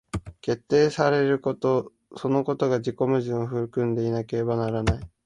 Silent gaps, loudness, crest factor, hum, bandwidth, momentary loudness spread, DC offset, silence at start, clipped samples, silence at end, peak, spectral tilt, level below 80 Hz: none; -25 LUFS; 18 dB; none; 11.5 kHz; 9 LU; under 0.1%; 0.15 s; under 0.1%; 0.2 s; -6 dBFS; -7 dB/octave; -44 dBFS